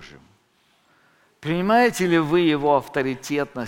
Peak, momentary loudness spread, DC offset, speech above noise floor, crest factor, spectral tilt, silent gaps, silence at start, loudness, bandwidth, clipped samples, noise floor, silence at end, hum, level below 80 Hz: -6 dBFS; 8 LU; under 0.1%; 42 dB; 18 dB; -5.5 dB/octave; none; 0 s; -20 LUFS; 17 kHz; under 0.1%; -63 dBFS; 0 s; none; -54 dBFS